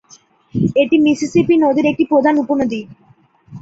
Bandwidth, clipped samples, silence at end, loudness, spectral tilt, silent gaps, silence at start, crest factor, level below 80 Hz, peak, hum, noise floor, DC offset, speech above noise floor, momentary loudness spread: 8 kHz; under 0.1%; 0.05 s; -15 LUFS; -6.5 dB/octave; none; 0.55 s; 14 dB; -52 dBFS; -2 dBFS; none; -51 dBFS; under 0.1%; 37 dB; 8 LU